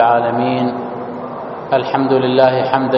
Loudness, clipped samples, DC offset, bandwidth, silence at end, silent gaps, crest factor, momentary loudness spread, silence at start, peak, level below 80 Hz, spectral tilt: -16 LUFS; under 0.1%; under 0.1%; 6 kHz; 0 s; none; 16 dB; 13 LU; 0 s; 0 dBFS; -58 dBFS; -4.5 dB/octave